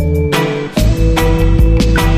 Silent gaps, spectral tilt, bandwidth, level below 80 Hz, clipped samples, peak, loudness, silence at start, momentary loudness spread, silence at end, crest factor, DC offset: none; -6 dB/octave; 15.5 kHz; -14 dBFS; under 0.1%; 0 dBFS; -13 LUFS; 0 s; 4 LU; 0 s; 10 dB; under 0.1%